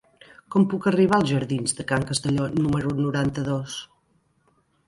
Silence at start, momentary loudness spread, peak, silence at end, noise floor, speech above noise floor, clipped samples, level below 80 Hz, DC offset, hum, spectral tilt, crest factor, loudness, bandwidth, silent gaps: 0.5 s; 8 LU; -8 dBFS; 1.05 s; -66 dBFS; 43 dB; under 0.1%; -52 dBFS; under 0.1%; none; -5.5 dB/octave; 16 dB; -23 LUFS; 11.5 kHz; none